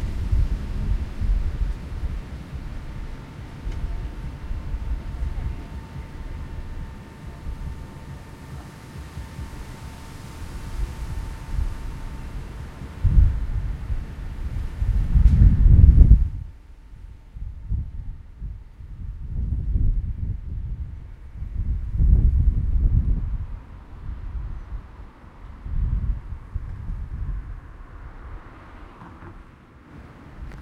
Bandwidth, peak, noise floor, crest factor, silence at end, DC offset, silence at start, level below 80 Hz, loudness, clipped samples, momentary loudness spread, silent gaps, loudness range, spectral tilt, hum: 6.6 kHz; 0 dBFS; -47 dBFS; 24 dB; 0 s; under 0.1%; 0 s; -24 dBFS; -26 LUFS; under 0.1%; 22 LU; none; 18 LU; -8.5 dB/octave; none